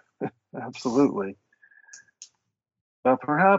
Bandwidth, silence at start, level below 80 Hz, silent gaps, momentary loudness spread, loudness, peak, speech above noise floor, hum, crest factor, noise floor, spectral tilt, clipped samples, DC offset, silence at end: 8 kHz; 0.2 s; -70 dBFS; 2.81-3.03 s; 15 LU; -26 LUFS; -6 dBFS; 33 dB; none; 20 dB; -55 dBFS; -5.5 dB/octave; under 0.1%; under 0.1%; 0 s